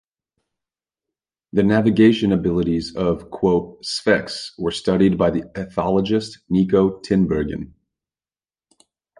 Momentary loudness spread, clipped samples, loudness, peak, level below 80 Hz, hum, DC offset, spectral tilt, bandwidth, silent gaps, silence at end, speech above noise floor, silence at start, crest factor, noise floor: 11 LU; under 0.1%; -19 LUFS; -2 dBFS; -44 dBFS; none; under 0.1%; -6.5 dB/octave; 11 kHz; none; 1.55 s; over 71 dB; 1.55 s; 18 dB; under -90 dBFS